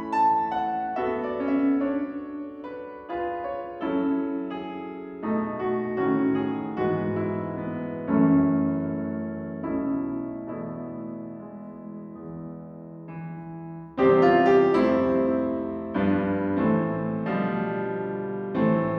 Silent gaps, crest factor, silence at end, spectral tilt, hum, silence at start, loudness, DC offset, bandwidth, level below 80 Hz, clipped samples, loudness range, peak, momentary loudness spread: none; 18 dB; 0 s; -9 dB/octave; none; 0 s; -26 LUFS; under 0.1%; 6 kHz; -58 dBFS; under 0.1%; 11 LU; -6 dBFS; 18 LU